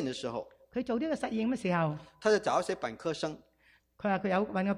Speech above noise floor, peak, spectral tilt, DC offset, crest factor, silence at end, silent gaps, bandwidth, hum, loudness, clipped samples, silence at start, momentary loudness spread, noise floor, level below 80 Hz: 35 dB; -14 dBFS; -6 dB/octave; under 0.1%; 18 dB; 0 s; none; 11.5 kHz; none; -32 LUFS; under 0.1%; 0 s; 10 LU; -67 dBFS; -66 dBFS